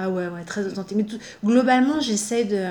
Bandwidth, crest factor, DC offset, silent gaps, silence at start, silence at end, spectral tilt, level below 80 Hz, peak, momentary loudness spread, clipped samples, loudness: 19.5 kHz; 16 dB; under 0.1%; none; 0 s; 0 s; -4.5 dB/octave; -62 dBFS; -6 dBFS; 11 LU; under 0.1%; -22 LUFS